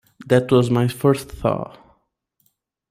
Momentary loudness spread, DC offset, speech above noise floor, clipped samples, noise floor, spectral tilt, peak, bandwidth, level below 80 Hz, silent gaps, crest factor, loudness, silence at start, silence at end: 9 LU; under 0.1%; 51 dB; under 0.1%; -69 dBFS; -7 dB/octave; -2 dBFS; 16 kHz; -48 dBFS; none; 20 dB; -19 LUFS; 0.2 s; 1.25 s